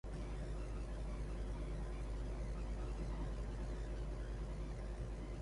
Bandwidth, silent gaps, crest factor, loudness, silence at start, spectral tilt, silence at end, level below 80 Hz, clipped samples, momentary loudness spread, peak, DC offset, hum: 11 kHz; none; 10 dB; -47 LUFS; 0.05 s; -7 dB/octave; 0 s; -44 dBFS; under 0.1%; 2 LU; -34 dBFS; under 0.1%; none